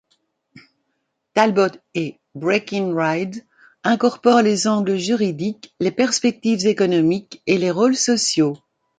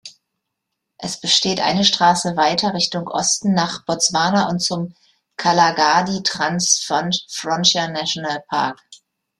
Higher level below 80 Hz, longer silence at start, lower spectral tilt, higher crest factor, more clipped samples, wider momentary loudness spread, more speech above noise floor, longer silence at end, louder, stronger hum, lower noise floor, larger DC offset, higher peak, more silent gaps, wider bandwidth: second, -66 dBFS vs -60 dBFS; first, 0.55 s vs 0.05 s; first, -4.5 dB/octave vs -2.5 dB/octave; about the same, 18 dB vs 20 dB; neither; first, 11 LU vs 8 LU; second, 55 dB vs 60 dB; about the same, 0.45 s vs 0.45 s; about the same, -19 LUFS vs -17 LUFS; neither; second, -73 dBFS vs -78 dBFS; neither; about the same, -2 dBFS vs 0 dBFS; neither; second, 9.6 kHz vs 13 kHz